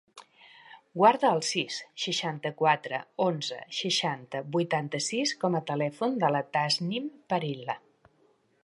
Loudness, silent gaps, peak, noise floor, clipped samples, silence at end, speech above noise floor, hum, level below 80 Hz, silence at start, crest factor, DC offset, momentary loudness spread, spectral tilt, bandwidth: -28 LUFS; none; -8 dBFS; -67 dBFS; under 0.1%; 0.85 s; 38 dB; none; -80 dBFS; 0.15 s; 22 dB; under 0.1%; 10 LU; -4 dB/octave; 11.5 kHz